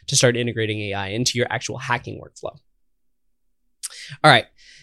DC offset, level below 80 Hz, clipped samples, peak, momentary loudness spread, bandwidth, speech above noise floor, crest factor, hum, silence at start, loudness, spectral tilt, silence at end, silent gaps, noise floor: under 0.1%; -58 dBFS; under 0.1%; 0 dBFS; 21 LU; 13.5 kHz; 53 dB; 22 dB; none; 0.1 s; -20 LUFS; -3.5 dB/octave; 0.4 s; none; -74 dBFS